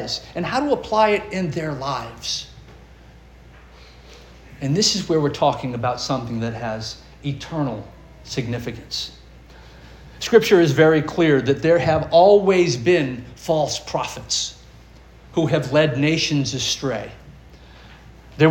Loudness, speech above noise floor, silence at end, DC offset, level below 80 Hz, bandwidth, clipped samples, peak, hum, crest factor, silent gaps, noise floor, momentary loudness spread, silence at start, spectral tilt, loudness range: -20 LUFS; 26 dB; 0 s; under 0.1%; -46 dBFS; 17 kHz; under 0.1%; -2 dBFS; none; 20 dB; none; -45 dBFS; 14 LU; 0 s; -5 dB/octave; 12 LU